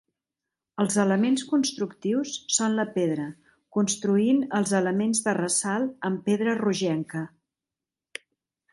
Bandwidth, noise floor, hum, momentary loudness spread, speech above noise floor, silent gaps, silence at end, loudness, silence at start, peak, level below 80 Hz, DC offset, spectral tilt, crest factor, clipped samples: 11.5 kHz; -90 dBFS; none; 13 LU; 65 dB; none; 1.45 s; -25 LUFS; 0.75 s; -8 dBFS; -70 dBFS; under 0.1%; -4.5 dB/octave; 18 dB; under 0.1%